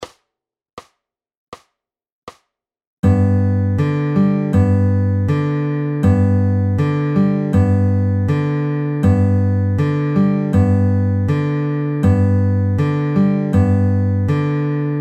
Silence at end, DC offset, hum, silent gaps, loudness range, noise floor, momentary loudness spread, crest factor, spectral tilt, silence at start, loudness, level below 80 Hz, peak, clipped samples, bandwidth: 0 s; under 0.1%; none; 0.73-0.77 s, 1.37-1.52 s, 2.12-2.27 s, 2.87-3.03 s; 3 LU; -84 dBFS; 4 LU; 12 dB; -10 dB/octave; 0 s; -16 LUFS; -42 dBFS; -4 dBFS; under 0.1%; 7.6 kHz